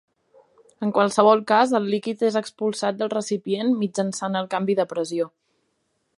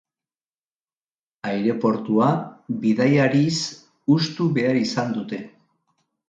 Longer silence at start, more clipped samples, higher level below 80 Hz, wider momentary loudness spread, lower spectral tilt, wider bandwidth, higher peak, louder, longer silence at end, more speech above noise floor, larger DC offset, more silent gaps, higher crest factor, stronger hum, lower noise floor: second, 0.8 s vs 1.45 s; neither; second, -74 dBFS vs -66 dBFS; second, 9 LU vs 13 LU; about the same, -5 dB/octave vs -6 dB/octave; first, 11.5 kHz vs 9 kHz; about the same, -2 dBFS vs -4 dBFS; about the same, -22 LUFS vs -21 LUFS; about the same, 0.9 s vs 0.8 s; second, 50 dB vs over 70 dB; neither; neither; about the same, 22 dB vs 18 dB; neither; second, -72 dBFS vs under -90 dBFS